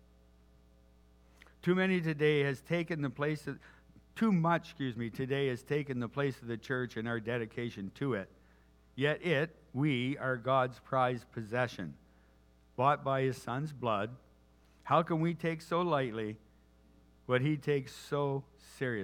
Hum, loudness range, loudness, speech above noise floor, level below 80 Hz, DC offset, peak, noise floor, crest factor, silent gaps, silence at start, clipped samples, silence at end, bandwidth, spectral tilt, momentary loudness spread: none; 3 LU; -34 LUFS; 31 dB; -66 dBFS; under 0.1%; -14 dBFS; -64 dBFS; 20 dB; none; 1.65 s; under 0.1%; 0 s; 15 kHz; -7 dB/octave; 11 LU